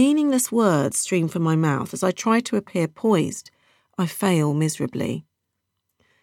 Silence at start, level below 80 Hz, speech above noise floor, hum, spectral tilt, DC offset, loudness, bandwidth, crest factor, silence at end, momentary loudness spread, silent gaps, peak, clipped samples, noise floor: 0 s; -68 dBFS; 57 dB; none; -5.5 dB/octave; under 0.1%; -22 LUFS; 17 kHz; 16 dB; 1 s; 9 LU; none; -6 dBFS; under 0.1%; -78 dBFS